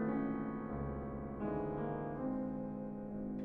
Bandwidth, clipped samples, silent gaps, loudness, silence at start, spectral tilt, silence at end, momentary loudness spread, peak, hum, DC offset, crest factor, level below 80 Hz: 3.6 kHz; under 0.1%; none; -41 LUFS; 0 s; -11.5 dB/octave; 0 s; 5 LU; -28 dBFS; none; under 0.1%; 12 dB; -54 dBFS